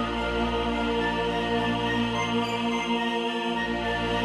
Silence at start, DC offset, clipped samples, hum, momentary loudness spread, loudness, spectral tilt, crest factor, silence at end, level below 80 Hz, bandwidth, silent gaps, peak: 0 s; under 0.1%; under 0.1%; none; 2 LU; -26 LUFS; -5 dB/octave; 14 dB; 0 s; -42 dBFS; 12 kHz; none; -14 dBFS